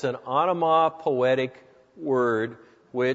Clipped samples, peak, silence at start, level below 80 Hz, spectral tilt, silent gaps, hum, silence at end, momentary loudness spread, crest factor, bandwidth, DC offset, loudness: under 0.1%; -8 dBFS; 0 s; -72 dBFS; -7 dB/octave; none; none; 0 s; 12 LU; 16 dB; 7.8 kHz; under 0.1%; -24 LUFS